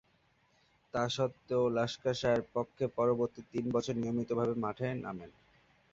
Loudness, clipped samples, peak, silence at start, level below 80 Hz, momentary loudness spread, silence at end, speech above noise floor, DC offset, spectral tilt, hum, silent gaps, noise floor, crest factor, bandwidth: -34 LUFS; under 0.1%; -16 dBFS; 0.95 s; -66 dBFS; 7 LU; 0.65 s; 38 dB; under 0.1%; -6 dB/octave; none; none; -71 dBFS; 18 dB; 7.8 kHz